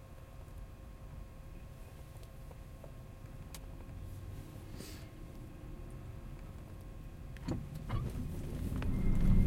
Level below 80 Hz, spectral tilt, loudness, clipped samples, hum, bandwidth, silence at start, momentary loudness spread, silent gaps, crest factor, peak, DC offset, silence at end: -42 dBFS; -7.5 dB/octave; -45 LUFS; under 0.1%; none; 16 kHz; 0 s; 14 LU; none; 20 dB; -18 dBFS; under 0.1%; 0 s